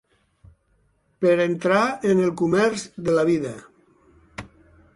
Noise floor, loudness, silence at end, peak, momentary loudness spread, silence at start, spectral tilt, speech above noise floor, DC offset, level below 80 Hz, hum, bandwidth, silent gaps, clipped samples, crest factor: -65 dBFS; -21 LUFS; 0.5 s; -6 dBFS; 20 LU; 1.2 s; -6 dB/octave; 44 dB; under 0.1%; -58 dBFS; none; 11.5 kHz; none; under 0.1%; 18 dB